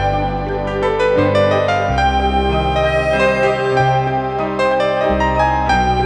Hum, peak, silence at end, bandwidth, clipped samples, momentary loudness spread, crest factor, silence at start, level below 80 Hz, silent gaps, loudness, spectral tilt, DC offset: none; -2 dBFS; 0 s; 10 kHz; under 0.1%; 5 LU; 12 dB; 0 s; -28 dBFS; none; -16 LUFS; -6.5 dB/octave; under 0.1%